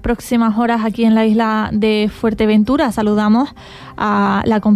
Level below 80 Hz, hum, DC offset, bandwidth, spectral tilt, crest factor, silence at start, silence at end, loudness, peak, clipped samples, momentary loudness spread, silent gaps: -38 dBFS; none; under 0.1%; 13.5 kHz; -6.5 dB/octave; 10 dB; 0 s; 0 s; -15 LUFS; -4 dBFS; under 0.1%; 5 LU; none